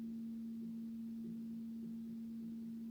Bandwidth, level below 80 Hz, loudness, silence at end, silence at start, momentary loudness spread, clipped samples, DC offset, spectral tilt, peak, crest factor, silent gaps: 20 kHz; -78 dBFS; -47 LUFS; 0 s; 0 s; 1 LU; under 0.1%; under 0.1%; -8 dB/octave; -40 dBFS; 6 dB; none